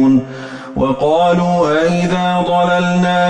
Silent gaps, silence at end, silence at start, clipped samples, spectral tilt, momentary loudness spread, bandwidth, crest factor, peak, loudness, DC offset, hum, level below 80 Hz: none; 0 s; 0 s; under 0.1%; -6.5 dB/octave; 7 LU; 9.2 kHz; 10 dB; -4 dBFS; -14 LUFS; under 0.1%; none; -42 dBFS